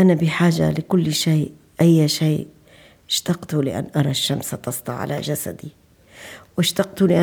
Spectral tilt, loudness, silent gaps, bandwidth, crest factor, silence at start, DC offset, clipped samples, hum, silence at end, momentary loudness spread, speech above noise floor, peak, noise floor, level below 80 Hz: -5.5 dB/octave; -20 LUFS; none; over 20 kHz; 16 dB; 0 s; under 0.1%; under 0.1%; none; 0 s; 14 LU; 31 dB; -4 dBFS; -50 dBFS; -56 dBFS